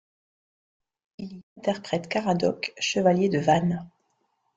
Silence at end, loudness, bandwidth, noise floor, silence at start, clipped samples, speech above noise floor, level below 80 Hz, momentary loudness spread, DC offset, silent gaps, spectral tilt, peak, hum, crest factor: 0.7 s; -25 LUFS; 7.8 kHz; -73 dBFS; 1.2 s; under 0.1%; 48 dB; -64 dBFS; 19 LU; under 0.1%; 1.43-1.56 s; -5.5 dB/octave; -8 dBFS; none; 20 dB